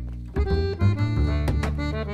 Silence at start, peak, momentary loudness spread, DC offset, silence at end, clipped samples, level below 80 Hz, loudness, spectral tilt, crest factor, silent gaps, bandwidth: 0 s; -10 dBFS; 5 LU; under 0.1%; 0 s; under 0.1%; -28 dBFS; -25 LUFS; -8 dB/octave; 14 dB; none; 10 kHz